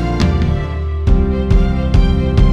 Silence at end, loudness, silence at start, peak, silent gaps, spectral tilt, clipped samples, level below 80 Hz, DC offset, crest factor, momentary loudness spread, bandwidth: 0 s; -15 LUFS; 0 s; 0 dBFS; none; -8 dB/octave; under 0.1%; -14 dBFS; under 0.1%; 12 dB; 4 LU; 8 kHz